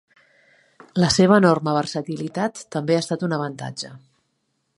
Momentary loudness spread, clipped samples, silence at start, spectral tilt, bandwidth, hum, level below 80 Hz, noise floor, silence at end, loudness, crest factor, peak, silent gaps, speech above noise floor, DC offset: 16 LU; under 0.1%; 0.95 s; -5.5 dB/octave; 11.5 kHz; none; -54 dBFS; -72 dBFS; 0.8 s; -21 LUFS; 20 dB; -2 dBFS; none; 52 dB; under 0.1%